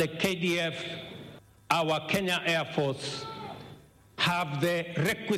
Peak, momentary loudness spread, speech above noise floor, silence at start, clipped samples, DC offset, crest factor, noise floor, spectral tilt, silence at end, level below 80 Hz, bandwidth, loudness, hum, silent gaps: -6 dBFS; 18 LU; 23 dB; 0 s; under 0.1%; under 0.1%; 24 dB; -53 dBFS; -4.5 dB/octave; 0 s; -64 dBFS; 16 kHz; -29 LUFS; none; none